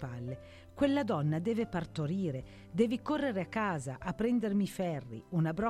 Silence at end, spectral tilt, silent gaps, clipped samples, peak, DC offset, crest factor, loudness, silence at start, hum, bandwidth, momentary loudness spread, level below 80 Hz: 0 s; -7 dB/octave; none; under 0.1%; -16 dBFS; under 0.1%; 18 dB; -34 LUFS; 0 s; none; 13.5 kHz; 11 LU; -58 dBFS